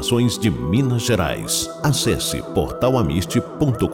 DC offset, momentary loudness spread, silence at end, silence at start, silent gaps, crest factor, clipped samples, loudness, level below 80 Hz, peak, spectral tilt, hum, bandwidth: under 0.1%; 3 LU; 0 s; 0 s; none; 12 dB; under 0.1%; -20 LUFS; -38 dBFS; -6 dBFS; -5 dB/octave; none; 17 kHz